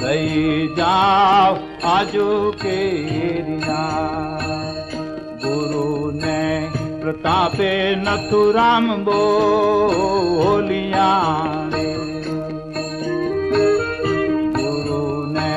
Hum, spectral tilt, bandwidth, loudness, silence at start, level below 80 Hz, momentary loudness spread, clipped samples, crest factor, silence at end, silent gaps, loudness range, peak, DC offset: none; -6 dB/octave; 10.5 kHz; -19 LUFS; 0 s; -46 dBFS; 10 LU; under 0.1%; 12 dB; 0 s; none; 6 LU; -6 dBFS; under 0.1%